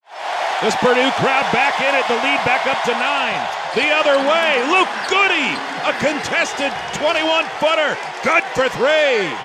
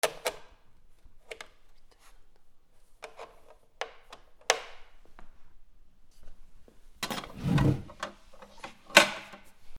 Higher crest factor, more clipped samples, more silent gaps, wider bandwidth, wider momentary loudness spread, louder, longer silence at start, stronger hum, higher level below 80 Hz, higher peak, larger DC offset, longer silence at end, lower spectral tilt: second, 16 dB vs 32 dB; neither; neither; second, 14 kHz vs 19 kHz; second, 6 LU vs 28 LU; first, -16 LUFS vs -29 LUFS; about the same, 0.1 s vs 0.05 s; neither; about the same, -56 dBFS vs -52 dBFS; about the same, -2 dBFS vs -2 dBFS; neither; about the same, 0 s vs 0 s; about the same, -3 dB/octave vs -3.5 dB/octave